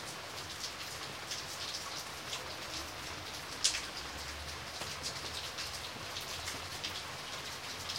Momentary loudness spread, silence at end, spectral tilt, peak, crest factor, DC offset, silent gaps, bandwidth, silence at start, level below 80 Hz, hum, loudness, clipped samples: 5 LU; 0 s; -1 dB/octave; -10 dBFS; 30 dB; under 0.1%; none; 16 kHz; 0 s; -60 dBFS; none; -39 LUFS; under 0.1%